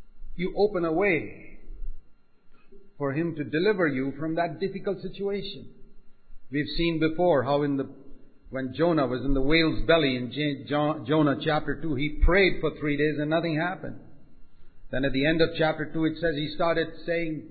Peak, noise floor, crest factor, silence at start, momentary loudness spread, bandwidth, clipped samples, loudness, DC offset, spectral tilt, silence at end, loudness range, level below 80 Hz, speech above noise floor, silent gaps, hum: -8 dBFS; -50 dBFS; 18 dB; 0 s; 12 LU; 4.8 kHz; under 0.1%; -26 LUFS; under 0.1%; -10.5 dB/octave; 0 s; 5 LU; -40 dBFS; 24 dB; none; none